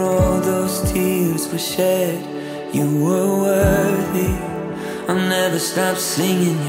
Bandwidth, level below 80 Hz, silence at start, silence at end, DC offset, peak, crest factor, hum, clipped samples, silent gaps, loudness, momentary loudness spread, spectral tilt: 16.5 kHz; -34 dBFS; 0 s; 0 s; under 0.1%; -2 dBFS; 16 dB; none; under 0.1%; none; -19 LUFS; 9 LU; -5 dB/octave